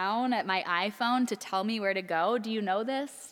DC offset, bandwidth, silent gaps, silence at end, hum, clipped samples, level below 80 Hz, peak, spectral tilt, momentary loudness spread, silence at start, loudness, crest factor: under 0.1%; 18 kHz; none; 0 s; none; under 0.1%; -86 dBFS; -14 dBFS; -4 dB/octave; 3 LU; 0 s; -30 LUFS; 16 dB